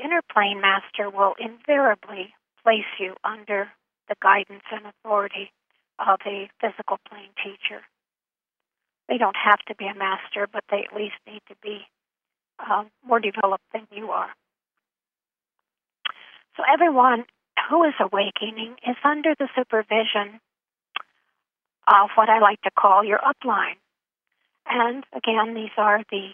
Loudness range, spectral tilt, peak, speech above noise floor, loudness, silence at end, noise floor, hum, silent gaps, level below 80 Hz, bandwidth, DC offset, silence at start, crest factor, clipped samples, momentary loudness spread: 9 LU; -6.5 dB/octave; -2 dBFS; over 68 dB; -22 LUFS; 0 s; under -90 dBFS; none; none; -86 dBFS; 3.8 kHz; under 0.1%; 0 s; 22 dB; under 0.1%; 18 LU